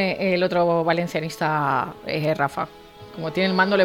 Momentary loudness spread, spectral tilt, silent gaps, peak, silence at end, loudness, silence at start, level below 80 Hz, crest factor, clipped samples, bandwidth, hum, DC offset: 10 LU; -6 dB/octave; none; -6 dBFS; 0 s; -23 LUFS; 0 s; -58 dBFS; 16 dB; under 0.1%; 17.5 kHz; none; under 0.1%